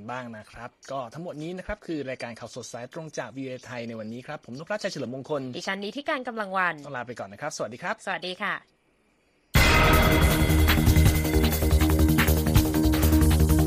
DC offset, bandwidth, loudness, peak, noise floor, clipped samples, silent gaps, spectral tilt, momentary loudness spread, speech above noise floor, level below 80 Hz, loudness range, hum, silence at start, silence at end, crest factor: under 0.1%; 15.5 kHz; -24 LUFS; -6 dBFS; -66 dBFS; under 0.1%; none; -5.5 dB/octave; 17 LU; 35 dB; -30 dBFS; 14 LU; none; 0 s; 0 s; 18 dB